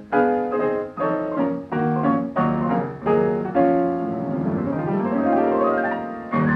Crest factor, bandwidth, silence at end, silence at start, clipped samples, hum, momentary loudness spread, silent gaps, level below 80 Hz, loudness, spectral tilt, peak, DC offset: 14 dB; 5.4 kHz; 0 s; 0 s; under 0.1%; none; 5 LU; none; -54 dBFS; -22 LUFS; -10 dB/octave; -6 dBFS; under 0.1%